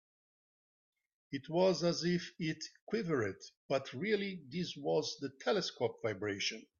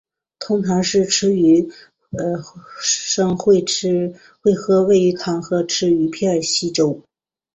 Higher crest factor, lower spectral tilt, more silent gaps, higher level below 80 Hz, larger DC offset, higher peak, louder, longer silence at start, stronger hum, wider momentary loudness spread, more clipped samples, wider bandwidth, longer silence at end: about the same, 18 dB vs 14 dB; about the same, -5 dB/octave vs -4.5 dB/octave; first, 2.82-2.87 s, 3.57-3.69 s vs none; second, -76 dBFS vs -56 dBFS; neither; second, -18 dBFS vs -4 dBFS; second, -37 LUFS vs -18 LUFS; first, 1.3 s vs 0.4 s; neither; second, 9 LU vs 12 LU; neither; second, 7.4 kHz vs 8.4 kHz; second, 0.2 s vs 0.55 s